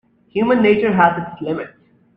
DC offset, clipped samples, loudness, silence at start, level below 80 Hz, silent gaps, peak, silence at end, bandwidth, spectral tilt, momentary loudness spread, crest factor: under 0.1%; under 0.1%; -17 LUFS; 0.35 s; -56 dBFS; none; 0 dBFS; 0.5 s; 5.4 kHz; -9 dB/octave; 13 LU; 18 dB